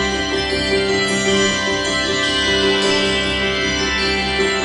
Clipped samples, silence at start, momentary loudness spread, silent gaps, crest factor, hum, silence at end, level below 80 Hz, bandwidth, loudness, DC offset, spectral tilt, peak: under 0.1%; 0 s; 3 LU; none; 12 dB; none; 0 s; -36 dBFS; 11 kHz; -16 LUFS; under 0.1%; -3 dB/octave; -4 dBFS